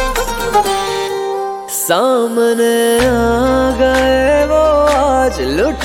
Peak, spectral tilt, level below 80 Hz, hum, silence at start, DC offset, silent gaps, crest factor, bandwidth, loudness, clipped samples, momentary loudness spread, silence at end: -2 dBFS; -4 dB/octave; -28 dBFS; none; 0 s; under 0.1%; none; 12 dB; 17 kHz; -13 LUFS; under 0.1%; 7 LU; 0 s